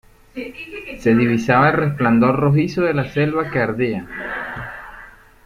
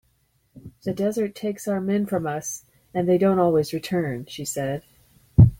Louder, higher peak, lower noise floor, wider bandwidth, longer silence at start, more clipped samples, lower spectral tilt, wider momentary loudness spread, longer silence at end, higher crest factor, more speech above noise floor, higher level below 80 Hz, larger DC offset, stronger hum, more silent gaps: first, -18 LUFS vs -24 LUFS; about the same, -2 dBFS vs -2 dBFS; second, -42 dBFS vs -66 dBFS; second, 11.5 kHz vs 17 kHz; second, 0.35 s vs 0.55 s; neither; about the same, -8 dB/octave vs -7 dB/octave; first, 17 LU vs 13 LU; first, 0.35 s vs 0.05 s; about the same, 16 dB vs 20 dB; second, 25 dB vs 43 dB; about the same, -46 dBFS vs -42 dBFS; neither; neither; neither